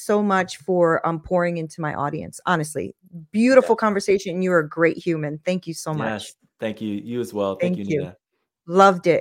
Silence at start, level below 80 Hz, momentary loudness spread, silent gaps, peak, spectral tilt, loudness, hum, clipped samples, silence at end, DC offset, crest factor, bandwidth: 0 s; -58 dBFS; 13 LU; none; 0 dBFS; -6 dB/octave; -21 LUFS; none; under 0.1%; 0 s; under 0.1%; 22 dB; 16 kHz